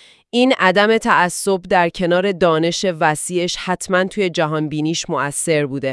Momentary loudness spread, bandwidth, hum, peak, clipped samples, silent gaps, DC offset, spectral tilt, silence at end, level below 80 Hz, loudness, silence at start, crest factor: 7 LU; 12 kHz; none; 0 dBFS; under 0.1%; none; under 0.1%; -4 dB/octave; 0 s; -50 dBFS; -17 LUFS; 0.35 s; 18 dB